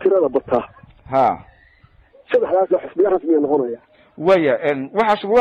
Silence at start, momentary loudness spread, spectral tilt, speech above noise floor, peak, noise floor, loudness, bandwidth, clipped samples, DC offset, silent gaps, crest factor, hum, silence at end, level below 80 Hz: 0 s; 7 LU; -7.5 dB/octave; 35 dB; -6 dBFS; -52 dBFS; -18 LUFS; 7.6 kHz; under 0.1%; under 0.1%; none; 12 dB; none; 0 s; -54 dBFS